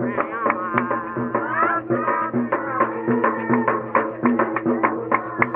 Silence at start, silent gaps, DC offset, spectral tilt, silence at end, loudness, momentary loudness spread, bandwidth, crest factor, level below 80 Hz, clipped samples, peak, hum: 0 s; none; under 0.1%; -6.5 dB/octave; 0 s; -21 LUFS; 3 LU; 3.6 kHz; 18 dB; -62 dBFS; under 0.1%; -4 dBFS; none